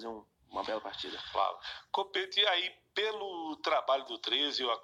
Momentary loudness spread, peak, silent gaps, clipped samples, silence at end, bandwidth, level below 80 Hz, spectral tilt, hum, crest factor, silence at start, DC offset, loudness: 12 LU; -16 dBFS; none; under 0.1%; 0 s; 12 kHz; -72 dBFS; -2 dB/octave; none; 18 dB; 0 s; under 0.1%; -33 LUFS